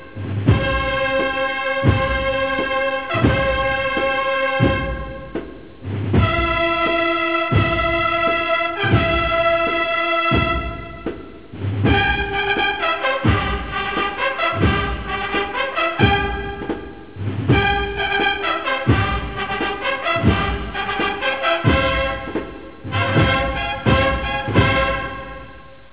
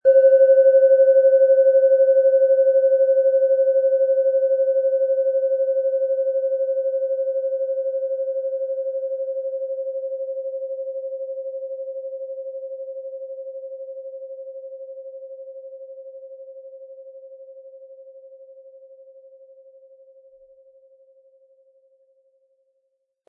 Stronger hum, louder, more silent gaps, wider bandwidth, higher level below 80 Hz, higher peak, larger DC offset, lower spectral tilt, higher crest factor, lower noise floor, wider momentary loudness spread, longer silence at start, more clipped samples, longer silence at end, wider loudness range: neither; about the same, -19 LUFS vs -19 LUFS; neither; first, 4 kHz vs 1.6 kHz; first, -30 dBFS vs -84 dBFS; first, -2 dBFS vs -6 dBFS; first, 0.7% vs under 0.1%; first, -9.5 dB/octave vs -6 dB/octave; about the same, 18 dB vs 14 dB; second, -41 dBFS vs -73 dBFS; second, 12 LU vs 24 LU; about the same, 0 s vs 0.05 s; neither; second, 0.15 s vs 4.6 s; second, 3 LU vs 23 LU